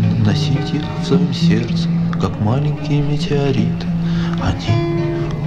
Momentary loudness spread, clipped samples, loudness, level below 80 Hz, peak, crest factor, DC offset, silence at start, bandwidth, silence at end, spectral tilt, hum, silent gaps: 4 LU; under 0.1%; -17 LUFS; -34 dBFS; -2 dBFS; 14 dB; under 0.1%; 0 s; 8 kHz; 0 s; -7.5 dB/octave; none; none